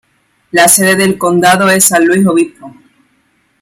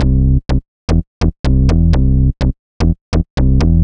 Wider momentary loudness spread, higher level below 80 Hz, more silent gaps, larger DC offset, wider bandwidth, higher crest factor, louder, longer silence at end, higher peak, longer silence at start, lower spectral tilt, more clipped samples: about the same, 7 LU vs 7 LU; second, -52 dBFS vs -14 dBFS; second, none vs 0.68-0.88 s, 1.07-1.21 s, 1.39-1.44 s, 2.59-2.80 s, 3.01-3.12 s, 3.30-3.37 s; neither; first, over 20 kHz vs 7.6 kHz; about the same, 10 dB vs 12 dB; first, -8 LUFS vs -15 LUFS; first, 0.9 s vs 0 s; about the same, 0 dBFS vs 0 dBFS; first, 0.55 s vs 0 s; second, -3.5 dB/octave vs -8.5 dB/octave; first, 0.2% vs under 0.1%